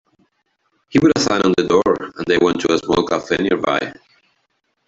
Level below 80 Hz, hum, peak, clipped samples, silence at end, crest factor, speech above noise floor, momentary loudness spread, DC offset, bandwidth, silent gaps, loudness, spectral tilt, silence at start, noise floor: -50 dBFS; none; -2 dBFS; under 0.1%; 0.95 s; 16 dB; 52 dB; 5 LU; under 0.1%; 8 kHz; none; -17 LUFS; -5 dB/octave; 0.9 s; -68 dBFS